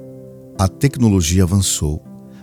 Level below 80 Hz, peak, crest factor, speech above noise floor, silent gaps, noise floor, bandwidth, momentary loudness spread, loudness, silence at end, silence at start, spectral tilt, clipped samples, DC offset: -32 dBFS; -2 dBFS; 16 dB; 21 dB; none; -37 dBFS; 18.5 kHz; 16 LU; -16 LUFS; 0.1 s; 0 s; -5 dB/octave; under 0.1%; under 0.1%